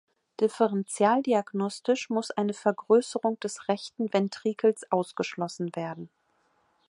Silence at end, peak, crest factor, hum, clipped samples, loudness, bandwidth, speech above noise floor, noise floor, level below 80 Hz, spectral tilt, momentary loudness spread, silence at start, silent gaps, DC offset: 0.85 s; -10 dBFS; 18 dB; none; under 0.1%; -28 LUFS; 11.5 kHz; 43 dB; -70 dBFS; -80 dBFS; -5.5 dB/octave; 9 LU; 0.4 s; none; under 0.1%